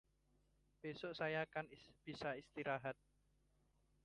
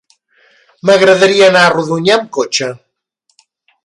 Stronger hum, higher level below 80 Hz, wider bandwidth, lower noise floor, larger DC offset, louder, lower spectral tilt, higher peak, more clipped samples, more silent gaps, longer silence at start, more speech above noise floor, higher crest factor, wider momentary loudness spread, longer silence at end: first, 50 Hz at -75 dBFS vs none; second, -78 dBFS vs -58 dBFS; about the same, 11 kHz vs 11.5 kHz; first, -79 dBFS vs -63 dBFS; neither; second, -47 LUFS vs -10 LUFS; first, -6 dB/octave vs -3.5 dB/octave; second, -28 dBFS vs 0 dBFS; neither; neither; about the same, 0.85 s vs 0.85 s; second, 32 dB vs 53 dB; first, 20 dB vs 12 dB; first, 13 LU vs 9 LU; about the same, 1.1 s vs 1.1 s